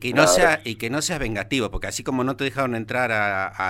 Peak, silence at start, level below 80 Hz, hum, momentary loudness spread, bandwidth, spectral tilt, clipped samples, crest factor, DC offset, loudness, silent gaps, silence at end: -2 dBFS; 0 s; -40 dBFS; none; 10 LU; 16.5 kHz; -3.5 dB/octave; under 0.1%; 20 dB; under 0.1%; -22 LUFS; none; 0 s